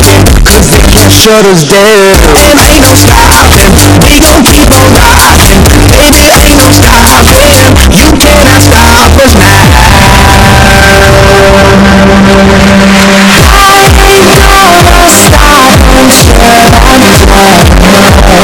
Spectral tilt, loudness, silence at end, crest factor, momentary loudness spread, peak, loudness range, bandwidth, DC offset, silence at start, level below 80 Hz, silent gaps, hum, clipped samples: -4 dB/octave; -1 LUFS; 0 s; 0 dB; 1 LU; 0 dBFS; 1 LU; 16 kHz; under 0.1%; 0 s; -8 dBFS; none; none; 80%